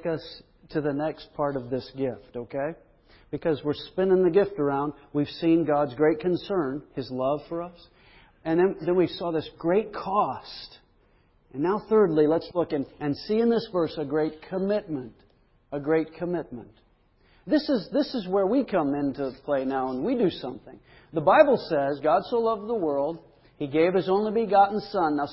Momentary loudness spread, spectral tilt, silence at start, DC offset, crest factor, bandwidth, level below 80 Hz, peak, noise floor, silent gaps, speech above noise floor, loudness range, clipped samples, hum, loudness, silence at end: 14 LU; -11 dB/octave; 0 s; under 0.1%; 22 dB; 5.8 kHz; -58 dBFS; -4 dBFS; -62 dBFS; none; 37 dB; 6 LU; under 0.1%; none; -26 LUFS; 0 s